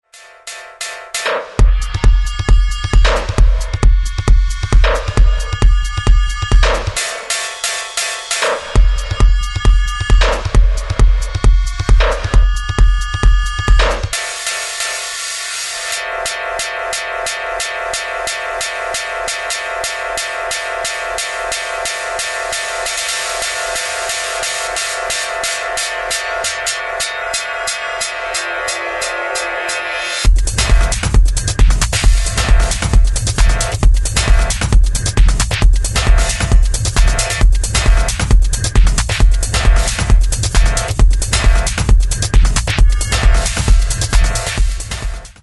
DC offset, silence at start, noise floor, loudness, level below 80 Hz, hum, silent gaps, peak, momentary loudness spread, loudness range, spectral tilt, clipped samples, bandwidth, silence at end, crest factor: under 0.1%; 0.15 s; -35 dBFS; -16 LUFS; -14 dBFS; none; none; 0 dBFS; 5 LU; 4 LU; -3 dB/octave; under 0.1%; 12 kHz; 0.1 s; 12 dB